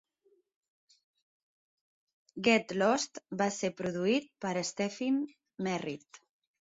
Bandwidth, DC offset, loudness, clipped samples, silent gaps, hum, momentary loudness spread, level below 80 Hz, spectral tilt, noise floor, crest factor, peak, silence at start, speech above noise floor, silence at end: 8 kHz; under 0.1%; -32 LUFS; under 0.1%; none; none; 11 LU; -76 dBFS; -4 dB/octave; -72 dBFS; 22 dB; -14 dBFS; 2.35 s; 40 dB; 0.5 s